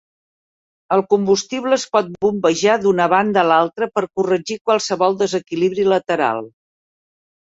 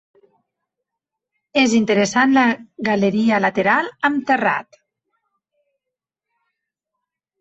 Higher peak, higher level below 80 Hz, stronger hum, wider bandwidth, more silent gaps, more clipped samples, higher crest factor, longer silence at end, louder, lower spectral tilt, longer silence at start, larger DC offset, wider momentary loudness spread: about the same, -2 dBFS vs -2 dBFS; about the same, -62 dBFS vs -62 dBFS; neither; about the same, 8 kHz vs 8.2 kHz; first, 4.61-4.65 s vs none; neither; about the same, 16 dB vs 18 dB; second, 0.95 s vs 2.8 s; about the same, -17 LUFS vs -17 LUFS; about the same, -4.5 dB/octave vs -4.5 dB/octave; second, 0.9 s vs 1.55 s; neither; about the same, 5 LU vs 7 LU